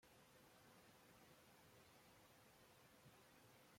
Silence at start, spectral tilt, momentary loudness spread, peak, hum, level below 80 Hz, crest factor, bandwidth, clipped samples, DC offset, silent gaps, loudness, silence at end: 0 s; -3.5 dB/octave; 1 LU; -56 dBFS; none; -88 dBFS; 14 dB; 16.5 kHz; under 0.1%; under 0.1%; none; -69 LUFS; 0 s